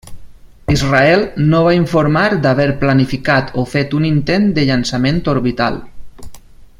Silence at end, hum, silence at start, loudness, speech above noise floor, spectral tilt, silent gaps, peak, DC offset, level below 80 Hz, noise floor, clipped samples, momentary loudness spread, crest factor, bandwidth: 0.15 s; none; 0.05 s; -14 LUFS; 22 dB; -6.5 dB/octave; none; 0 dBFS; under 0.1%; -34 dBFS; -35 dBFS; under 0.1%; 6 LU; 14 dB; 12.5 kHz